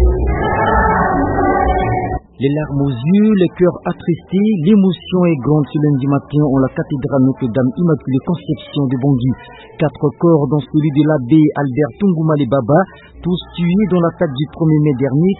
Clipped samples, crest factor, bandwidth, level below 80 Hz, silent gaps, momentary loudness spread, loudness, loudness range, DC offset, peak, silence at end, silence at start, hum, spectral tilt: under 0.1%; 14 dB; 4.1 kHz; -28 dBFS; none; 8 LU; -15 LUFS; 2 LU; under 0.1%; 0 dBFS; 0 s; 0 s; none; -13.5 dB/octave